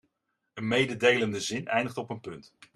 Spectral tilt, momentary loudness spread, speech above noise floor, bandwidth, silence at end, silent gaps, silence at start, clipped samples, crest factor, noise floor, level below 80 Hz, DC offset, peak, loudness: -4 dB/octave; 20 LU; 51 dB; 13 kHz; 0.35 s; none; 0.55 s; under 0.1%; 22 dB; -80 dBFS; -68 dBFS; under 0.1%; -8 dBFS; -27 LUFS